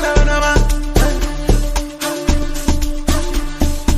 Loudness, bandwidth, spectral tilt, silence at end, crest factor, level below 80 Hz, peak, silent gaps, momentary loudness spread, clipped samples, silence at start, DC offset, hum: -18 LUFS; 15.5 kHz; -4.5 dB/octave; 0 s; 14 dB; -16 dBFS; 0 dBFS; none; 6 LU; under 0.1%; 0 s; under 0.1%; none